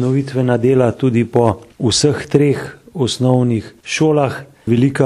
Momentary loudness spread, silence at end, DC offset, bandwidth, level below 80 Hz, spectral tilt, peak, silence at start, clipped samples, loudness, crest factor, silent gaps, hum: 8 LU; 0 s; under 0.1%; 12 kHz; -48 dBFS; -6 dB/octave; 0 dBFS; 0 s; under 0.1%; -16 LUFS; 14 dB; none; none